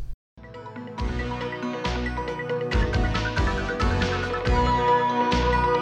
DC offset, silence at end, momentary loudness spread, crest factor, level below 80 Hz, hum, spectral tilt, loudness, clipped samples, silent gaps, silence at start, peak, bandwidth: under 0.1%; 0 s; 14 LU; 14 dB; -30 dBFS; none; -6 dB/octave; -25 LUFS; under 0.1%; 0.14-0.37 s; 0 s; -10 dBFS; 9 kHz